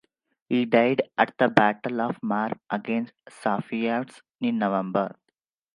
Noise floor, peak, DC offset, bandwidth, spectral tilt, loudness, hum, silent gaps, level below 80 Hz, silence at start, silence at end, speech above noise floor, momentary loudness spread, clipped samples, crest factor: -78 dBFS; 0 dBFS; under 0.1%; 11 kHz; -7 dB/octave; -25 LUFS; none; 4.35-4.39 s; -72 dBFS; 0.5 s; 0.65 s; 53 dB; 10 LU; under 0.1%; 26 dB